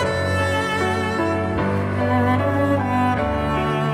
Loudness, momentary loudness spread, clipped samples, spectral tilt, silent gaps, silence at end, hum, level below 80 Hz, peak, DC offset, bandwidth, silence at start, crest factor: -20 LUFS; 3 LU; under 0.1%; -6.5 dB/octave; none; 0 s; none; -38 dBFS; -8 dBFS; under 0.1%; 15 kHz; 0 s; 12 dB